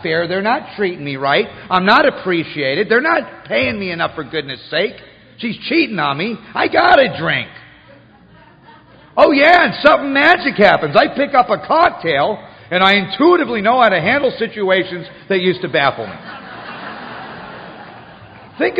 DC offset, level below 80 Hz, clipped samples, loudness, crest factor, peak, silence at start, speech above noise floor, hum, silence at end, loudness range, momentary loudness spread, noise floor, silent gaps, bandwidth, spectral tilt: under 0.1%; -52 dBFS; under 0.1%; -14 LUFS; 16 dB; 0 dBFS; 0 s; 30 dB; none; 0 s; 7 LU; 18 LU; -45 dBFS; none; 7.8 kHz; -6.5 dB/octave